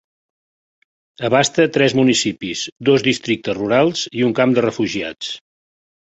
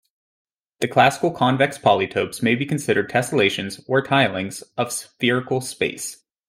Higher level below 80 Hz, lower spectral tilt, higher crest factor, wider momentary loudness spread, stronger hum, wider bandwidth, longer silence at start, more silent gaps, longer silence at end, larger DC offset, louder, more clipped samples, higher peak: first, -56 dBFS vs -62 dBFS; about the same, -4.5 dB/octave vs -4.5 dB/octave; about the same, 18 dB vs 18 dB; about the same, 11 LU vs 10 LU; neither; second, 8.2 kHz vs 16 kHz; first, 1.2 s vs 0.8 s; first, 2.72-2.76 s vs none; first, 0.7 s vs 0.35 s; neither; first, -17 LUFS vs -21 LUFS; neither; about the same, -2 dBFS vs -2 dBFS